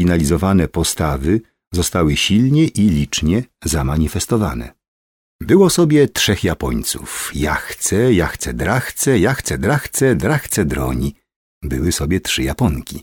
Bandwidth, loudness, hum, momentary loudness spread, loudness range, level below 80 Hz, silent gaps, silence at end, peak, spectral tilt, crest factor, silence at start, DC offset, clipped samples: 19.5 kHz; -17 LUFS; none; 8 LU; 2 LU; -30 dBFS; 1.67-1.71 s, 4.88-5.39 s, 11.36-11.61 s; 0 s; -2 dBFS; -5 dB/octave; 16 dB; 0 s; under 0.1%; under 0.1%